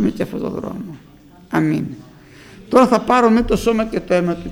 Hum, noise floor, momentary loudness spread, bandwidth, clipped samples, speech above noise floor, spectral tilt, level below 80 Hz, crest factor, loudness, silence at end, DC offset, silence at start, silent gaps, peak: none; -42 dBFS; 16 LU; 19 kHz; under 0.1%; 25 dB; -6.5 dB/octave; -38 dBFS; 18 dB; -17 LUFS; 0 s; under 0.1%; 0 s; none; 0 dBFS